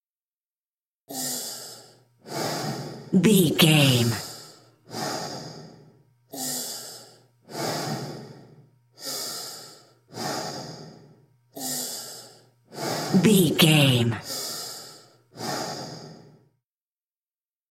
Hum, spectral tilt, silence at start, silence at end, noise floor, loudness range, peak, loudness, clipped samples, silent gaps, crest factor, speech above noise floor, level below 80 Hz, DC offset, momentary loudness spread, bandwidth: none; -4.5 dB/octave; 1.1 s; 1.5 s; under -90 dBFS; 12 LU; -4 dBFS; -24 LUFS; under 0.1%; none; 24 dB; over 71 dB; -66 dBFS; under 0.1%; 24 LU; 16.5 kHz